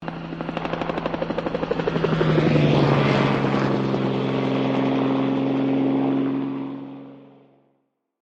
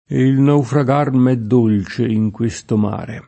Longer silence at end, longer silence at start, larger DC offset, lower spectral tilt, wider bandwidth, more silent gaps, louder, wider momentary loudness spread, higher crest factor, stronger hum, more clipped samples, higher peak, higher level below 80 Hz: first, 1.05 s vs 0.05 s; about the same, 0 s vs 0.1 s; neither; about the same, -8 dB/octave vs -8 dB/octave; second, 7.6 kHz vs 8.6 kHz; neither; second, -22 LUFS vs -16 LUFS; first, 12 LU vs 5 LU; about the same, 16 dB vs 14 dB; neither; neither; second, -6 dBFS vs -2 dBFS; about the same, -50 dBFS vs -50 dBFS